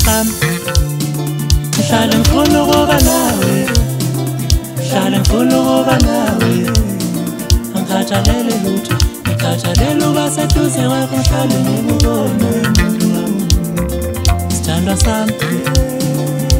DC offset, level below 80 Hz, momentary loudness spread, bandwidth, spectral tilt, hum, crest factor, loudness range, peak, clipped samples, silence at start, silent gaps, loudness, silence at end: under 0.1%; -20 dBFS; 6 LU; 16.5 kHz; -5 dB/octave; none; 12 dB; 3 LU; 0 dBFS; under 0.1%; 0 s; none; -14 LUFS; 0 s